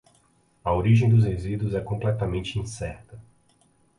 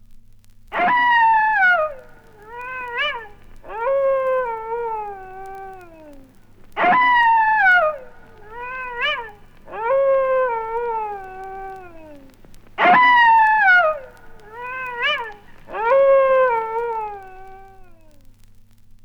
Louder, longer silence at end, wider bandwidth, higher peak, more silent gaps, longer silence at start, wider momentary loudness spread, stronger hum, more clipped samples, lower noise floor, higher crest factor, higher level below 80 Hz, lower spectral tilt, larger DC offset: second, -25 LUFS vs -17 LUFS; second, 0.75 s vs 1.2 s; first, 10.5 kHz vs 6.8 kHz; second, -8 dBFS vs -4 dBFS; neither; first, 0.65 s vs 0.1 s; second, 15 LU vs 22 LU; neither; neither; first, -63 dBFS vs -46 dBFS; about the same, 16 dB vs 16 dB; first, -42 dBFS vs -48 dBFS; first, -7.5 dB/octave vs -4 dB/octave; neither